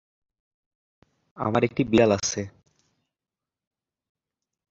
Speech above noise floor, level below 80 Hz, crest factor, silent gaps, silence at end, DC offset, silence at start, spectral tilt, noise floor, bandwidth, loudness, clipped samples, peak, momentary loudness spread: 67 dB; -56 dBFS; 24 dB; none; 2.2 s; under 0.1%; 1.35 s; -5 dB/octave; -90 dBFS; 8 kHz; -23 LUFS; under 0.1%; -6 dBFS; 13 LU